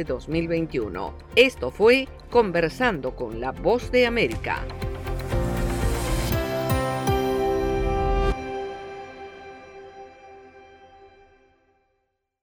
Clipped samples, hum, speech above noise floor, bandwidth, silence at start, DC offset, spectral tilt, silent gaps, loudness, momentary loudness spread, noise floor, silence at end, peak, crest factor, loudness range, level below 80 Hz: under 0.1%; none; 52 dB; over 20 kHz; 0 s; under 0.1%; -5.5 dB/octave; none; -24 LUFS; 21 LU; -75 dBFS; 1.35 s; -4 dBFS; 20 dB; 11 LU; -34 dBFS